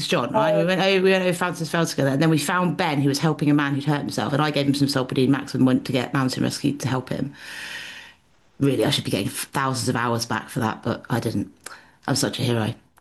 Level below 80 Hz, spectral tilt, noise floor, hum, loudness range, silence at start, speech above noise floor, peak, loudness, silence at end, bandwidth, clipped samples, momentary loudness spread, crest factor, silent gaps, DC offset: -58 dBFS; -5 dB/octave; -56 dBFS; none; 5 LU; 0 s; 34 dB; -8 dBFS; -22 LUFS; 0.25 s; 12.5 kHz; under 0.1%; 10 LU; 14 dB; none; under 0.1%